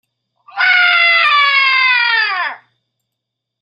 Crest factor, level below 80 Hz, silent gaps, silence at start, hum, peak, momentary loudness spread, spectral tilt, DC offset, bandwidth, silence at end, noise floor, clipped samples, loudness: 14 dB; -82 dBFS; none; 0.55 s; none; 0 dBFS; 10 LU; 1 dB/octave; under 0.1%; 8.6 kHz; 1.05 s; -78 dBFS; under 0.1%; -10 LUFS